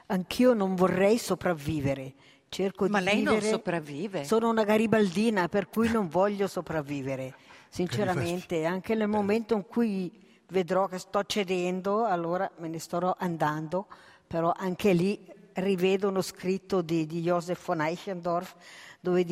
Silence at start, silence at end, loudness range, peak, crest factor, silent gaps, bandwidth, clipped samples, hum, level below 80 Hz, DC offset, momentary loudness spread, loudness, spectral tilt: 0.1 s; 0 s; 4 LU; -10 dBFS; 18 dB; none; 16 kHz; under 0.1%; none; -62 dBFS; under 0.1%; 10 LU; -28 LUFS; -6 dB/octave